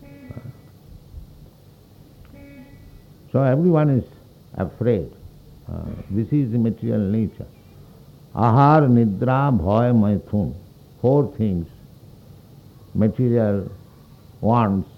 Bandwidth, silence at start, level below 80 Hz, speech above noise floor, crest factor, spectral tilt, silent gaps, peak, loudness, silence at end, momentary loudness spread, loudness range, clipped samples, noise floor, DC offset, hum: 6 kHz; 0.1 s; -46 dBFS; 30 dB; 18 dB; -10.5 dB/octave; none; -2 dBFS; -20 LUFS; 0.15 s; 21 LU; 6 LU; under 0.1%; -48 dBFS; under 0.1%; none